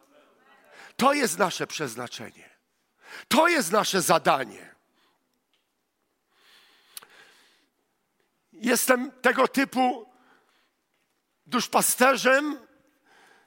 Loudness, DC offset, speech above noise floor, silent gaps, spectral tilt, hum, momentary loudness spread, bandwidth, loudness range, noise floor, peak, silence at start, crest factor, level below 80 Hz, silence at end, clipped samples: -23 LUFS; under 0.1%; 52 dB; none; -2.5 dB/octave; none; 21 LU; 16.5 kHz; 5 LU; -76 dBFS; -4 dBFS; 0.8 s; 24 dB; -76 dBFS; 0.9 s; under 0.1%